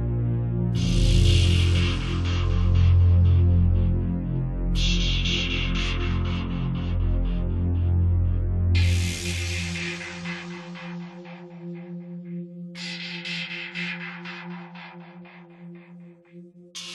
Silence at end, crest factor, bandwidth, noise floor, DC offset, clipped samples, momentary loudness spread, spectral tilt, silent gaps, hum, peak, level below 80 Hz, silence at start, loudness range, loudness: 0 s; 16 dB; 11.5 kHz; -47 dBFS; under 0.1%; under 0.1%; 19 LU; -5.5 dB/octave; none; none; -8 dBFS; -30 dBFS; 0 s; 14 LU; -24 LUFS